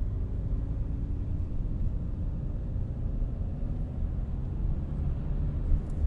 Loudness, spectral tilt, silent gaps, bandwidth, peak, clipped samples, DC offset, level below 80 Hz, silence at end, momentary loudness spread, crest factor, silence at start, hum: -34 LUFS; -10.5 dB/octave; none; 3.2 kHz; -12 dBFS; under 0.1%; under 0.1%; -32 dBFS; 0 s; 2 LU; 16 dB; 0 s; none